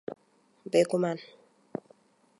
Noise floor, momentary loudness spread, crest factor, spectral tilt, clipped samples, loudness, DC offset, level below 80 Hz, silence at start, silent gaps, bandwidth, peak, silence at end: -66 dBFS; 21 LU; 22 dB; -5.5 dB/octave; under 0.1%; -28 LUFS; under 0.1%; -82 dBFS; 0.1 s; none; 11.5 kHz; -12 dBFS; 1.15 s